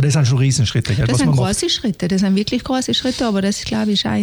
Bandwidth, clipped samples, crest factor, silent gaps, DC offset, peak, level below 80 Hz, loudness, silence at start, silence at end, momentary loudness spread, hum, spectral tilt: 19 kHz; under 0.1%; 12 dB; none; under 0.1%; -4 dBFS; -38 dBFS; -17 LUFS; 0 s; 0 s; 4 LU; none; -5 dB/octave